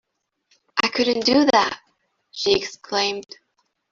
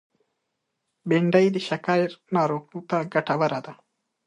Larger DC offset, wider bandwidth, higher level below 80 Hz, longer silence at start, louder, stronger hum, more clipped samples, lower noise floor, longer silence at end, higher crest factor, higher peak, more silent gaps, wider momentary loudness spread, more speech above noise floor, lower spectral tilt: neither; second, 7.6 kHz vs 10.5 kHz; first, -58 dBFS vs -74 dBFS; second, 0.75 s vs 1.05 s; first, -20 LUFS vs -24 LUFS; neither; neither; second, -68 dBFS vs -79 dBFS; first, 0.7 s vs 0.55 s; about the same, 20 dB vs 20 dB; first, -2 dBFS vs -6 dBFS; neither; about the same, 14 LU vs 12 LU; second, 48 dB vs 56 dB; second, -3 dB/octave vs -7 dB/octave